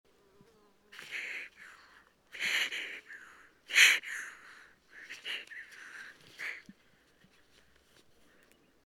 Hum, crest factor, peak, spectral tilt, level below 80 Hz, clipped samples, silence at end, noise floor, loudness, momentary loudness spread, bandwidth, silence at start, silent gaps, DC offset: none; 30 dB; -8 dBFS; 2.5 dB/octave; -80 dBFS; under 0.1%; 2.25 s; -67 dBFS; -30 LUFS; 29 LU; over 20 kHz; 0.95 s; none; under 0.1%